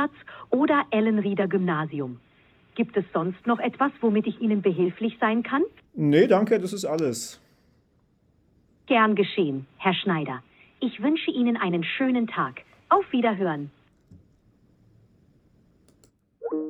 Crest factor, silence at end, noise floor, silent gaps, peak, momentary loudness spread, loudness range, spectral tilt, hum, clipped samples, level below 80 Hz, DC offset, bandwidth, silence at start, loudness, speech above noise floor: 20 dB; 0 s; -65 dBFS; none; -6 dBFS; 12 LU; 5 LU; -6 dB/octave; none; under 0.1%; -68 dBFS; under 0.1%; 14 kHz; 0 s; -25 LUFS; 41 dB